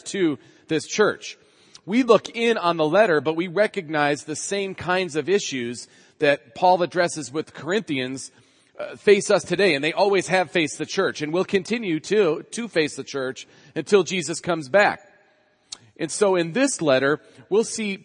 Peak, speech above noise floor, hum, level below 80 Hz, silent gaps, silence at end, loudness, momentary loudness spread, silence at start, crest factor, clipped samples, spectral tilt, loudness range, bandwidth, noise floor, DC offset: -2 dBFS; 39 dB; none; -70 dBFS; none; 0.05 s; -22 LUFS; 13 LU; 0.05 s; 22 dB; under 0.1%; -4 dB/octave; 3 LU; 10.5 kHz; -61 dBFS; under 0.1%